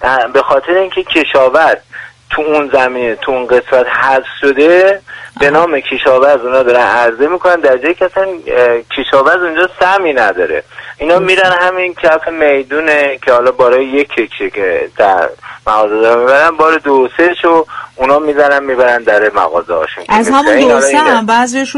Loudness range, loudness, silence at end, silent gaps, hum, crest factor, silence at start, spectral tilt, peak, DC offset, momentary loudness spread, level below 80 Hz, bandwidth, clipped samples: 2 LU; -10 LUFS; 0 s; none; none; 10 dB; 0 s; -3.5 dB/octave; 0 dBFS; under 0.1%; 8 LU; -44 dBFS; 11.5 kHz; 0.2%